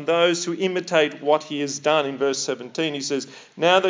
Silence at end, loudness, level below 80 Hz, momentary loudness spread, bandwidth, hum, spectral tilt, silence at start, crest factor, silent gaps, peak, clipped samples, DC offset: 0 s; -22 LUFS; -86 dBFS; 8 LU; 7.8 kHz; none; -3.5 dB/octave; 0 s; 18 dB; none; -4 dBFS; under 0.1%; under 0.1%